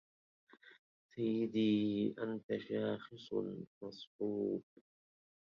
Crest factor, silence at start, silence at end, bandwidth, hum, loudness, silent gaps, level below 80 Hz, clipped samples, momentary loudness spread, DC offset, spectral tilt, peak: 16 dB; 0.65 s; 0.95 s; 6.8 kHz; none; -39 LUFS; 0.79-1.09 s, 2.43-2.49 s, 3.67-3.81 s, 4.07-4.19 s; -78 dBFS; under 0.1%; 15 LU; under 0.1%; -6 dB/octave; -24 dBFS